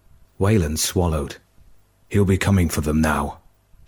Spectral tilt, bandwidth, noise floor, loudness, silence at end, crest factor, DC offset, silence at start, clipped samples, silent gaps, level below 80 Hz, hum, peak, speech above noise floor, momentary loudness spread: -5.5 dB/octave; 18 kHz; -52 dBFS; -21 LUFS; 0.5 s; 16 dB; under 0.1%; 0.4 s; under 0.1%; none; -34 dBFS; none; -6 dBFS; 33 dB; 10 LU